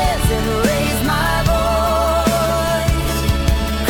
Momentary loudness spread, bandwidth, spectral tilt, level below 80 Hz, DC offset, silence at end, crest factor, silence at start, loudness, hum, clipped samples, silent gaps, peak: 2 LU; 17.5 kHz; -5 dB/octave; -22 dBFS; under 0.1%; 0 s; 12 dB; 0 s; -17 LUFS; none; under 0.1%; none; -4 dBFS